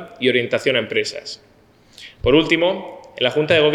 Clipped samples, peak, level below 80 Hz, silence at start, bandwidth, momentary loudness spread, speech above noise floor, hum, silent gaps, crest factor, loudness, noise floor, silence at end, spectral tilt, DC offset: under 0.1%; -2 dBFS; -44 dBFS; 0 s; 12 kHz; 17 LU; 34 dB; none; none; 18 dB; -18 LUFS; -52 dBFS; 0 s; -5 dB/octave; under 0.1%